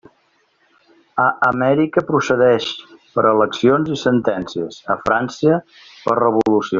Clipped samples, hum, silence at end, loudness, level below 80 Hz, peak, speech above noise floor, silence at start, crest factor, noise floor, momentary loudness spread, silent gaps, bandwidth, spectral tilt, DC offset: under 0.1%; none; 0 s; -17 LUFS; -56 dBFS; -2 dBFS; 44 dB; 1.15 s; 16 dB; -61 dBFS; 11 LU; none; 7.6 kHz; -4.5 dB/octave; under 0.1%